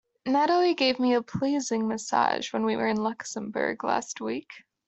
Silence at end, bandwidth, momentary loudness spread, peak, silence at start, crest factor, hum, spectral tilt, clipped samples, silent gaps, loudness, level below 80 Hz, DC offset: 0.3 s; 8.4 kHz; 10 LU; -8 dBFS; 0.25 s; 18 dB; none; -4 dB/octave; under 0.1%; none; -27 LUFS; -68 dBFS; under 0.1%